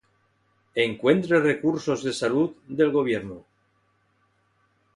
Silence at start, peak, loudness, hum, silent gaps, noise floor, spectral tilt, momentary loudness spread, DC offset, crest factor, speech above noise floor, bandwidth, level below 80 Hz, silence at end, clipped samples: 0.75 s; -6 dBFS; -24 LUFS; none; none; -68 dBFS; -5.5 dB/octave; 10 LU; under 0.1%; 20 dB; 44 dB; 11.5 kHz; -64 dBFS; 1.55 s; under 0.1%